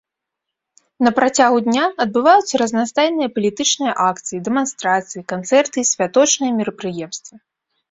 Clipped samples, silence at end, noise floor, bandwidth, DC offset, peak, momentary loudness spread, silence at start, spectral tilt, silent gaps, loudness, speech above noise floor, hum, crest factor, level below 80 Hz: under 0.1%; 0.55 s; -81 dBFS; 8.2 kHz; under 0.1%; -2 dBFS; 12 LU; 1 s; -3 dB/octave; none; -17 LUFS; 64 dB; none; 16 dB; -62 dBFS